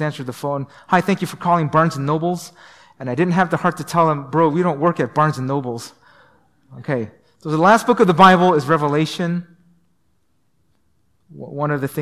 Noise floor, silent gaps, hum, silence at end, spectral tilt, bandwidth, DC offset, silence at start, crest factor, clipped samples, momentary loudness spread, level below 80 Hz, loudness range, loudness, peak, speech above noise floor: -67 dBFS; none; none; 0 s; -6.5 dB/octave; 15 kHz; 0.1%; 0 s; 18 dB; under 0.1%; 15 LU; -60 dBFS; 6 LU; -18 LUFS; -2 dBFS; 50 dB